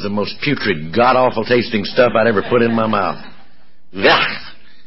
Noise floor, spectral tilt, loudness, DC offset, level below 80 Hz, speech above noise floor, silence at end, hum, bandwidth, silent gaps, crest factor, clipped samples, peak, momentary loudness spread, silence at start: -53 dBFS; -9.5 dB/octave; -15 LUFS; 3%; -48 dBFS; 38 dB; 0.35 s; none; 5.8 kHz; none; 16 dB; under 0.1%; -2 dBFS; 9 LU; 0 s